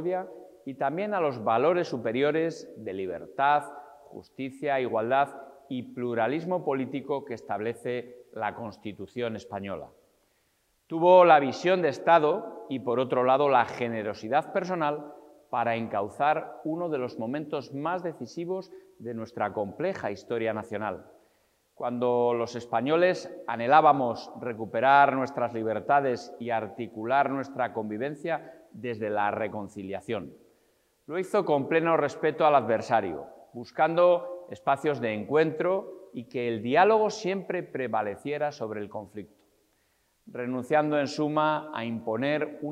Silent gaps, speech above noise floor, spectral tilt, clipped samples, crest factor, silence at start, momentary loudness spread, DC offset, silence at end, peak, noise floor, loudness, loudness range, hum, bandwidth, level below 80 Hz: none; 44 dB; -6.5 dB/octave; under 0.1%; 22 dB; 0 s; 16 LU; under 0.1%; 0 s; -6 dBFS; -71 dBFS; -27 LUFS; 9 LU; none; 12 kHz; -76 dBFS